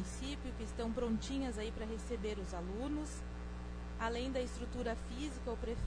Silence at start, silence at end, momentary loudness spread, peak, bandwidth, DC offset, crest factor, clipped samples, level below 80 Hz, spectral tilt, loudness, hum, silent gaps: 0 s; 0 s; 8 LU; -26 dBFS; 10.5 kHz; under 0.1%; 14 dB; under 0.1%; -46 dBFS; -5.5 dB/octave; -42 LUFS; none; none